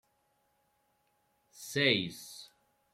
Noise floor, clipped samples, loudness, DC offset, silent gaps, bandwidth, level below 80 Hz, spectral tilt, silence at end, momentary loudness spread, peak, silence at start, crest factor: -75 dBFS; under 0.1%; -30 LUFS; under 0.1%; none; 16.5 kHz; -76 dBFS; -3.5 dB/octave; 0.5 s; 21 LU; -12 dBFS; 1.55 s; 26 dB